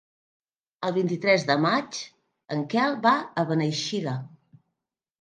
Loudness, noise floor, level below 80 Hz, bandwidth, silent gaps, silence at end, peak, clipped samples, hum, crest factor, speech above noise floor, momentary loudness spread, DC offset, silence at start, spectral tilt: -25 LUFS; -85 dBFS; -74 dBFS; 9.8 kHz; none; 0.95 s; -6 dBFS; under 0.1%; none; 22 dB; 60 dB; 13 LU; under 0.1%; 0.8 s; -5 dB/octave